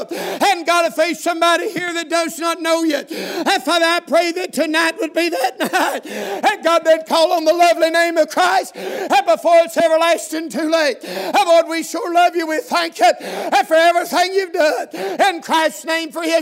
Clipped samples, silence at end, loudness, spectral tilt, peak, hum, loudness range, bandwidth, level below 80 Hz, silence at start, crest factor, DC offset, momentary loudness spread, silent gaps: under 0.1%; 0 s; -16 LUFS; -2 dB/octave; -2 dBFS; none; 3 LU; 16 kHz; -78 dBFS; 0 s; 14 dB; under 0.1%; 8 LU; none